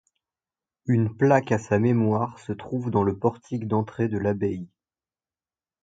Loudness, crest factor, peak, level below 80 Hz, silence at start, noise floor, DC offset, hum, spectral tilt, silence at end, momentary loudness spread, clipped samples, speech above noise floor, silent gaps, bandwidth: -24 LUFS; 20 dB; -6 dBFS; -54 dBFS; 0.85 s; under -90 dBFS; under 0.1%; none; -8.5 dB/octave; 1.15 s; 11 LU; under 0.1%; over 66 dB; none; 7.8 kHz